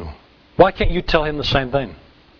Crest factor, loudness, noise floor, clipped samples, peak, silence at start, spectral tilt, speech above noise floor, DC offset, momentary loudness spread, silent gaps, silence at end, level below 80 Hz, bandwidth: 20 dB; -18 LUFS; -39 dBFS; under 0.1%; 0 dBFS; 0 s; -6.5 dB/octave; 22 dB; under 0.1%; 17 LU; none; 0.45 s; -28 dBFS; 5.4 kHz